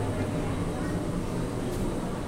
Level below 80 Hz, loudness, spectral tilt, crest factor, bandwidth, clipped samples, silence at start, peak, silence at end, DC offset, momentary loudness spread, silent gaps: -38 dBFS; -31 LUFS; -6.5 dB/octave; 12 dB; 16 kHz; under 0.1%; 0 s; -18 dBFS; 0 s; 0.2%; 1 LU; none